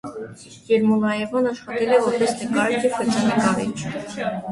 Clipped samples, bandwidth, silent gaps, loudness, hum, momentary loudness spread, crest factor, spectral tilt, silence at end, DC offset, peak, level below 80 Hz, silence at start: under 0.1%; 11.5 kHz; none; -21 LUFS; none; 11 LU; 18 dB; -5 dB/octave; 0 s; under 0.1%; -4 dBFS; -58 dBFS; 0.05 s